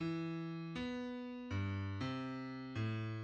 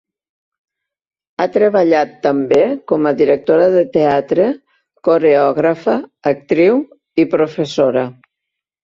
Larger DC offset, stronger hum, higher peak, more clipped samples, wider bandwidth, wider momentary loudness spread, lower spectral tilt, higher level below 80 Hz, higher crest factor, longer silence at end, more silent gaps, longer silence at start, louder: neither; neither; second, -28 dBFS vs -2 dBFS; neither; about the same, 8 kHz vs 7.4 kHz; second, 4 LU vs 8 LU; about the same, -7.5 dB/octave vs -7 dB/octave; second, -68 dBFS vs -58 dBFS; about the same, 14 dB vs 14 dB; second, 0 s vs 0.7 s; neither; second, 0 s vs 1.4 s; second, -43 LUFS vs -14 LUFS